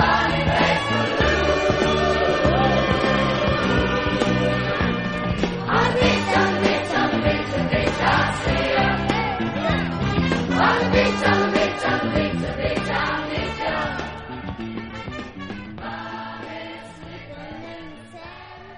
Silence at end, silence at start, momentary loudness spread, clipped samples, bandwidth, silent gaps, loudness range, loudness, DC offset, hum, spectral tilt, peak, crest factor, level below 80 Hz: 0 s; 0 s; 16 LU; under 0.1%; 10 kHz; none; 13 LU; -20 LUFS; under 0.1%; none; -5.5 dB/octave; -4 dBFS; 18 dB; -36 dBFS